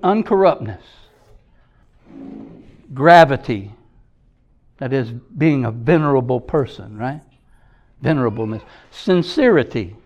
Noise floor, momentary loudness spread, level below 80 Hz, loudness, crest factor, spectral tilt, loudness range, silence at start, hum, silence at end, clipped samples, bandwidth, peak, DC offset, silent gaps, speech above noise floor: -55 dBFS; 23 LU; -48 dBFS; -17 LUFS; 18 dB; -7.5 dB/octave; 4 LU; 0.05 s; none; 0.1 s; under 0.1%; 11 kHz; 0 dBFS; under 0.1%; none; 39 dB